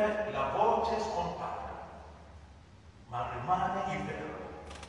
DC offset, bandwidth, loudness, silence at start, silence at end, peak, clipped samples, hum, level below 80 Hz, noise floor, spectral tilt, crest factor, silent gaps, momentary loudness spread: under 0.1%; 11 kHz; -34 LUFS; 0 s; 0 s; -14 dBFS; under 0.1%; none; -56 dBFS; -55 dBFS; -5.5 dB/octave; 20 dB; none; 22 LU